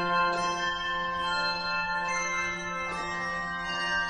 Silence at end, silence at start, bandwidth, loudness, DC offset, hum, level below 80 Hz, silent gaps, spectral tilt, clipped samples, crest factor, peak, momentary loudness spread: 0 s; 0 s; 11 kHz; -29 LUFS; under 0.1%; none; -54 dBFS; none; -2.5 dB/octave; under 0.1%; 16 dB; -14 dBFS; 5 LU